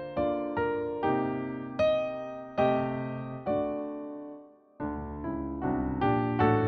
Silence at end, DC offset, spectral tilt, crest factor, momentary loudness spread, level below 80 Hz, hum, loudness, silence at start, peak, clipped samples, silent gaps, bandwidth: 0 s; under 0.1%; -9 dB/octave; 18 dB; 11 LU; -50 dBFS; none; -31 LUFS; 0 s; -12 dBFS; under 0.1%; none; 6.2 kHz